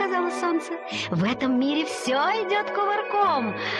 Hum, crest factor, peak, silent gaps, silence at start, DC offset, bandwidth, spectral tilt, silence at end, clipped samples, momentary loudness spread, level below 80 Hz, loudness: none; 12 dB; -12 dBFS; none; 0 s; under 0.1%; 12.5 kHz; -5 dB/octave; 0 s; under 0.1%; 5 LU; -66 dBFS; -24 LUFS